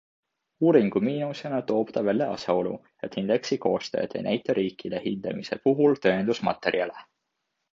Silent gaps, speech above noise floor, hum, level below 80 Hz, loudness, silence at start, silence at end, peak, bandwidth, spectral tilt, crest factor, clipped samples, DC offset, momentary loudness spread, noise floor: none; 55 dB; none; -66 dBFS; -26 LUFS; 0.6 s; 0.7 s; -6 dBFS; 7.6 kHz; -6.5 dB/octave; 20 dB; under 0.1%; under 0.1%; 10 LU; -80 dBFS